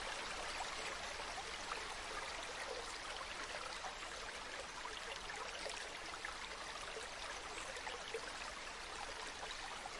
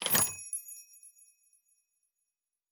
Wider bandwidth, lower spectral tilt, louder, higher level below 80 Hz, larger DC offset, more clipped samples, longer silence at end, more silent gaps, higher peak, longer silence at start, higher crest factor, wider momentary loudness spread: second, 11.5 kHz vs over 20 kHz; about the same, -1 dB/octave vs -1 dB/octave; second, -45 LUFS vs -30 LUFS; first, -62 dBFS vs -72 dBFS; neither; neither; second, 0 s vs 1.6 s; neither; second, -28 dBFS vs -8 dBFS; about the same, 0 s vs 0 s; second, 18 dB vs 30 dB; second, 3 LU vs 27 LU